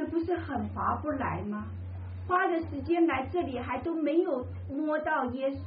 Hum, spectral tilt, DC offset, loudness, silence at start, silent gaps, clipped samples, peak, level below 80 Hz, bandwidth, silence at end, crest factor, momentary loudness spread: none; -6 dB/octave; under 0.1%; -31 LUFS; 0 s; none; under 0.1%; -14 dBFS; -54 dBFS; 5 kHz; 0 s; 16 dB; 10 LU